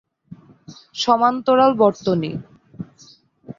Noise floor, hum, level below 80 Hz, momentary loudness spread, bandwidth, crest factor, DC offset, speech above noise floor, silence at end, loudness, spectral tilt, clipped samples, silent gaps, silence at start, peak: -51 dBFS; none; -60 dBFS; 22 LU; 7.6 kHz; 18 dB; under 0.1%; 34 dB; 0.05 s; -18 LUFS; -6 dB/octave; under 0.1%; none; 0.3 s; -2 dBFS